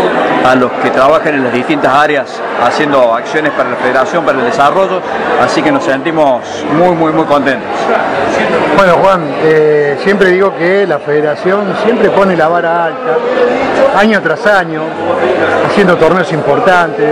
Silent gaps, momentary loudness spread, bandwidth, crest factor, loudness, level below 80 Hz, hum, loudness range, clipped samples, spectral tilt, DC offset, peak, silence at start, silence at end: none; 5 LU; 12 kHz; 10 dB; -10 LUFS; -44 dBFS; none; 2 LU; 2%; -5.5 dB/octave; under 0.1%; 0 dBFS; 0 s; 0 s